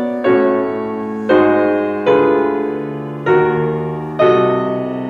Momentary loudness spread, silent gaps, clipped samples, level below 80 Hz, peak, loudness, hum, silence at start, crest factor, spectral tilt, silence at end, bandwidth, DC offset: 9 LU; none; under 0.1%; -52 dBFS; -2 dBFS; -15 LUFS; none; 0 s; 14 dB; -8.5 dB/octave; 0 s; 6.2 kHz; under 0.1%